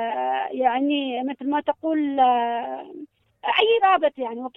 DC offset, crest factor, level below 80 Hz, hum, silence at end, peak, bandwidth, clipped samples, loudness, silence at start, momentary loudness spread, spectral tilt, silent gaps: under 0.1%; 18 dB; -70 dBFS; none; 0.1 s; -6 dBFS; 4.1 kHz; under 0.1%; -22 LUFS; 0 s; 13 LU; -5.5 dB/octave; none